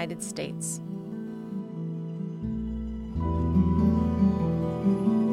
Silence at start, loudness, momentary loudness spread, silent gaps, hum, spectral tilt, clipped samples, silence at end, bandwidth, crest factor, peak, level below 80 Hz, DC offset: 0 s; -28 LUFS; 12 LU; none; none; -7 dB/octave; under 0.1%; 0 s; 13 kHz; 14 dB; -12 dBFS; -40 dBFS; under 0.1%